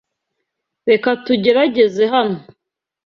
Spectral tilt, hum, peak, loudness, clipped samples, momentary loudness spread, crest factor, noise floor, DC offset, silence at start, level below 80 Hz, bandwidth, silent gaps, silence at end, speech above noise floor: -6 dB/octave; none; -2 dBFS; -15 LUFS; under 0.1%; 9 LU; 16 dB; -76 dBFS; under 0.1%; 0.85 s; -62 dBFS; 6.8 kHz; none; 0.65 s; 61 dB